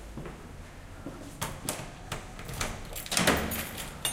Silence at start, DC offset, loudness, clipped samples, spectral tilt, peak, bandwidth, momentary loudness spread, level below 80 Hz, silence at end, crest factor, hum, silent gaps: 0 s; under 0.1%; -32 LUFS; under 0.1%; -3 dB/octave; -8 dBFS; 17 kHz; 19 LU; -46 dBFS; 0 s; 26 dB; none; none